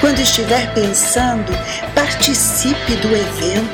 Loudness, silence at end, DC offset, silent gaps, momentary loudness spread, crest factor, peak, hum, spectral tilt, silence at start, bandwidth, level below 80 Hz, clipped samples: -14 LUFS; 0 s; under 0.1%; none; 6 LU; 14 dB; 0 dBFS; none; -3 dB/octave; 0 s; 19 kHz; -32 dBFS; under 0.1%